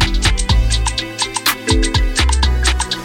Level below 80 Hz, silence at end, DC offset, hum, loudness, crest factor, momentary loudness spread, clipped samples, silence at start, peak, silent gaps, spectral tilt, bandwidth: -16 dBFS; 0 s; under 0.1%; none; -16 LUFS; 14 dB; 3 LU; under 0.1%; 0 s; 0 dBFS; none; -3 dB/octave; 17 kHz